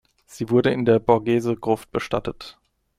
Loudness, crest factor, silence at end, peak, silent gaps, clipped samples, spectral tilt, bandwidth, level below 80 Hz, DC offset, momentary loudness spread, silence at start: -21 LUFS; 20 dB; 0.45 s; -2 dBFS; none; under 0.1%; -7 dB/octave; 15 kHz; -52 dBFS; under 0.1%; 15 LU; 0.3 s